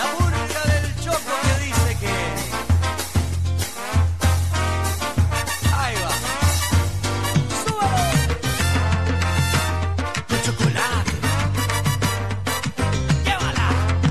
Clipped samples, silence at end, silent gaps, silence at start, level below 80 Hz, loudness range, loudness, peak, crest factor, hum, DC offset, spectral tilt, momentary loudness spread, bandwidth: under 0.1%; 0 s; none; 0 s; -30 dBFS; 1 LU; -21 LUFS; -6 dBFS; 14 dB; none; 1%; -4.5 dB/octave; 4 LU; 13.5 kHz